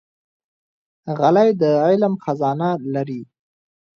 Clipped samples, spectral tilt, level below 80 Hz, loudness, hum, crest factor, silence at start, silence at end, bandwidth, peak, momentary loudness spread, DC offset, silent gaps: under 0.1%; -8.5 dB/octave; -68 dBFS; -18 LUFS; none; 18 dB; 1.05 s; 0.75 s; 6.8 kHz; -2 dBFS; 14 LU; under 0.1%; none